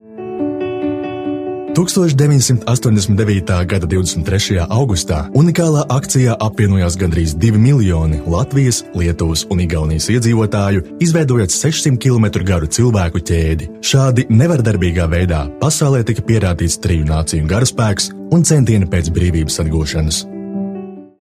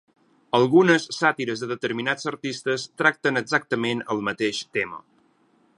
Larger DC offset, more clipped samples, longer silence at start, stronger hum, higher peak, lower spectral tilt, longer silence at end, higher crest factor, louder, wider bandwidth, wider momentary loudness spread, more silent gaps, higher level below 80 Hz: neither; neither; second, 0.1 s vs 0.55 s; neither; about the same, 0 dBFS vs -2 dBFS; about the same, -5.5 dB/octave vs -4.5 dB/octave; second, 0.15 s vs 0.8 s; second, 14 dB vs 22 dB; first, -14 LUFS vs -23 LUFS; first, 15.5 kHz vs 11 kHz; about the same, 8 LU vs 10 LU; neither; first, -28 dBFS vs -70 dBFS